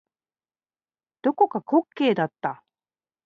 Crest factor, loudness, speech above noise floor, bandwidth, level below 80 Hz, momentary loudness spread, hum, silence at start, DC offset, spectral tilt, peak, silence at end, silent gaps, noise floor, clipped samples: 20 dB; -24 LUFS; over 67 dB; 6.8 kHz; -78 dBFS; 11 LU; none; 1.25 s; under 0.1%; -8 dB/octave; -6 dBFS; 0.7 s; none; under -90 dBFS; under 0.1%